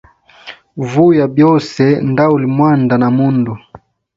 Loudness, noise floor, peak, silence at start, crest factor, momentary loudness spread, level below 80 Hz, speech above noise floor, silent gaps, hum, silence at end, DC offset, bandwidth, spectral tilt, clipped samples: -12 LUFS; -36 dBFS; 0 dBFS; 0.45 s; 12 dB; 11 LU; -50 dBFS; 25 dB; none; none; 0.4 s; under 0.1%; 7.6 kHz; -8.5 dB/octave; under 0.1%